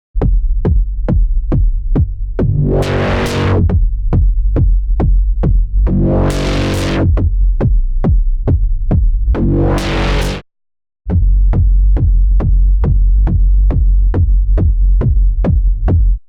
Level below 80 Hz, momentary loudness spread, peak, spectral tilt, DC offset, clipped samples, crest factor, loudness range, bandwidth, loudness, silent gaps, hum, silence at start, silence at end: -12 dBFS; 3 LU; -4 dBFS; -7.5 dB/octave; under 0.1%; under 0.1%; 8 dB; 2 LU; 8 kHz; -15 LUFS; none; none; 0.15 s; 0.1 s